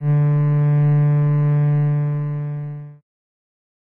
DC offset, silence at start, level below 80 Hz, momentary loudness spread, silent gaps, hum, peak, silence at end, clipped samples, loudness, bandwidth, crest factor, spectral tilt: under 0.1%; 0 s; -56 dBFS; 12 LU; none; none; -8 dBFS; 1.05 s; under 0.1%; -18 LUFS; 2.8 kHz; 10 dB; -12.5 dB/octave